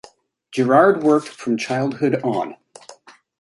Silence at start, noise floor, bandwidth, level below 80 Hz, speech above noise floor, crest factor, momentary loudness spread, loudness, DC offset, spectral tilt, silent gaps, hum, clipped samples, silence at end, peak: 0.5 s; -48 dBFS; 11.5 kHz; -68 dBFS; 31 dB; 18 dB; 12 LU; -19 LUFS; under 0.1%; -6.5 dB/octave; none; none; under 0.1%; 0.5 s; -2 dBFS